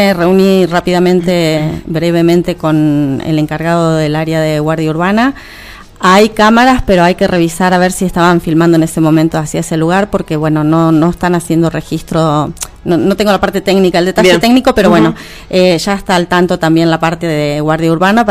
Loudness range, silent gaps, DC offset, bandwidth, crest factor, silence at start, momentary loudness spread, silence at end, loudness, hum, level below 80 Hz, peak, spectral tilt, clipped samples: 3 LU; none; under 0.1%; 16 kHz; 10 dB; 0 s; 7 LU; 0 s; -10 LUFS; none; -34 dBFS; 0 dBFS; -6 dB/octave; 0.2%